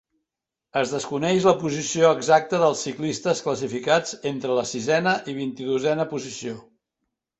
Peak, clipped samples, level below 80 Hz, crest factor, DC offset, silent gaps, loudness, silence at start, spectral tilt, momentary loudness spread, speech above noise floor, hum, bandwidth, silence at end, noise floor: -4 dBFS; under 0.1%; -64 dBFS; 20 dB; under 0.1%; none; -23 LUFS; 0.75 s; -4.5 dB/octave; 10 LU; 63 dB; none; 8.2 kHz; 0.8 s; -86 dBFS